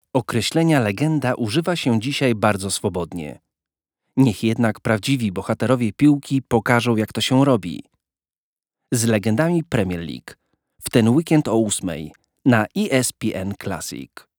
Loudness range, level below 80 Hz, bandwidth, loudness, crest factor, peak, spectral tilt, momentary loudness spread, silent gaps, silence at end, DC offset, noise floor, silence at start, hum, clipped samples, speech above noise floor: 3 LU; -54 dBFS; over 20 kHz; -20 LUFS; 20 dB; -2 dBFS; -5.5 dB/octave; 12 LU; 8.38-8.56 s; 0.3 s; under 0.1%; under -90 dBFS; 0.15 s; none; under 0.1%; over 71 dB